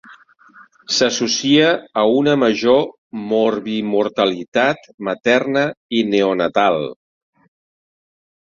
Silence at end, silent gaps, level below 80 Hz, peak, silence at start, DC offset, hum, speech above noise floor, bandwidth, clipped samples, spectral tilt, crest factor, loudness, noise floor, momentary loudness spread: 1.5 s; 2.98-3.10 s, 4.48-4.52 s, 4.94-4.98 s, 5.77-5.89 s; -60 dBFS; -2 dBFS; 0.1 s; under 0.1%; none; 31 dB; 7.6 kHz; under 0.1%; -4 dB/octave; 16 dB; -17 LUFS; -47 dBFS; 8 LU